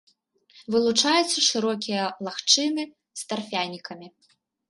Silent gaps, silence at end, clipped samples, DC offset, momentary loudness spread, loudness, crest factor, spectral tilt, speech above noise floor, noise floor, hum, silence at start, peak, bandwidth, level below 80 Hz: none; 0.6 s; under 0.1%; under 0.1%; 17 LU; -23 LUFS; 22 dB; -2 dB/octave; 36 dB; -60 dBFS; none; 0.55 s; -4 dBFS; 11.5 kHz; -74 dBFS